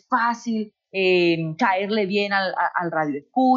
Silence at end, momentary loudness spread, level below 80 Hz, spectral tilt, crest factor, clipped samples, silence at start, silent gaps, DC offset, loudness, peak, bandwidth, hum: 0 s; 8 LU; -74 dBFS; -6 dB/octave; 16 dB; under 0.1%; 0.1 s; none; under 0.1%; -22 LUFS; -6 dBFS; 7.4 kHz; none